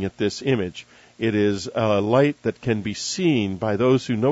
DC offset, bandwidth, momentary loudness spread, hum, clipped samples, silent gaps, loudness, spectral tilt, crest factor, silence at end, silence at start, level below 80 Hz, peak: under 0.1%; 8 kHz; 7 LU; none; under 0.1%; none; -22 LUFS; -5.5 dB/octave; 16 dB; 0 s; 0 s; -56 dBFS; -4 dBFS